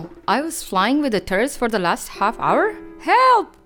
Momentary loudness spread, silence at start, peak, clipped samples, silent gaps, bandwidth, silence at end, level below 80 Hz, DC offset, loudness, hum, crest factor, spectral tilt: 8 LU; 0 s; -4 dBFS; under 0.1%; none; 19 kHz; 0.15 s; -46 dBFS; under 0.1%; -19 LUFS; none; 14 dB; -4 dB/octave